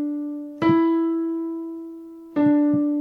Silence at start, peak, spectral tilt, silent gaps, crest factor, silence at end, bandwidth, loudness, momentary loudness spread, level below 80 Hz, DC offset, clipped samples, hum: 0 s; -6 dBFS; -9 dB/octave; none; 16 dB; 0 s; 5 kHz; -22 LUFS; 16 LU; -64 dBFS; under 0.1%; under 0.1%; none